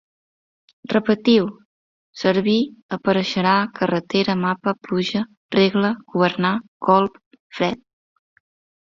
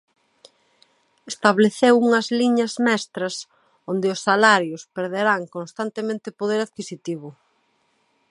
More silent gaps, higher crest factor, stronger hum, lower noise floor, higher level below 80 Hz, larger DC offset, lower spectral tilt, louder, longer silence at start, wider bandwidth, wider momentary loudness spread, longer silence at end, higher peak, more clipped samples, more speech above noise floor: first, 1.65-2.13 s, 2.82-2.89 s, 5.37-5.49 s, 6.68-6.80 s, 7.26-7.31 s, 7.40-7.50 s vs none; about the same, 18 dB vs 22 dB; neither; first, under -90 dBFS vs -66 dBFS; first, -60 dBFS vs -74 dBFS; neither; first, -6.5 dB/octave vs -4.5 dB/octave; about the same, -20 LUFS vs -21 LUFS; second, 0.9 s vs 1.25 s; second, 7.4 kHz vs 11.5 kHz; second, 7 LU vs 17 LU; about the same, 1.05 s vs 1 s; about the same, -2 dBFS vs 0 dBFS; neither; first, over 71 dB vs 46 dB